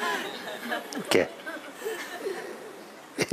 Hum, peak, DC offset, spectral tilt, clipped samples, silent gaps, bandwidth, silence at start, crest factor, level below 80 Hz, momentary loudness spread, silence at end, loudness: none; -6 dBFS; under 0.1%; -3 dB/octave; under 0.1%; none; 15.5 kHz; 0 s; 26 dB; -72 dBFS; 15 LU; 0 s; -31 LUFS